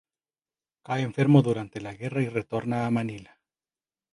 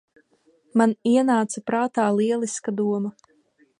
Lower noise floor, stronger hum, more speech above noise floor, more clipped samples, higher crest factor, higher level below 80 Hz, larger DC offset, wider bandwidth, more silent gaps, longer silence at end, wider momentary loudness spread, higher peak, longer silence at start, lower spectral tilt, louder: first, under -90 dBFS vs -62 dBFS; neither; first, over 65 dB vs 39 dB; neither; about the same, 22 dB vs 18 dB; first, -64 dBFS vs -72 dBFS; neither; about the same, 11 kHz vs 11 kHz; neither; first, 0.9 s vs 0.7 s; first, 15 LU vs 7 LU; about the same, -6 dBFS vs -4 dBFS; first, 0.9 s vs 0.75 s; first, -8 dB/octave vs -5.5 dB/octave; second, -26 LUFS vs -23 LUFS